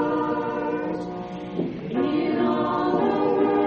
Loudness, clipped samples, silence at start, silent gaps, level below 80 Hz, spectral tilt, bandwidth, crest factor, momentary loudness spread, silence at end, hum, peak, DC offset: -25 LUFS; under 0.1%; 0 s; none; -56 dBFS; -5.5 dB/octave; 6.8 kHz; 14 dB; 9 LU; 0 s; none; -10 dBFS; under 0.1%